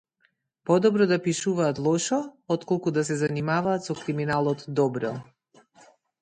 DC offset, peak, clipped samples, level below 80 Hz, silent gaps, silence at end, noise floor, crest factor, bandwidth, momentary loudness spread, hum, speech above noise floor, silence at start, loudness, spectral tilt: under 0.1%; -8 dBFS; under 0.1%; -64 dBFS; none; 1 s; -70 dBFS; 18 dB; 9.6 kHz; 9 LU; none; 45 dB; 0.65 s; -25 LUFS; -5.5 dB/octave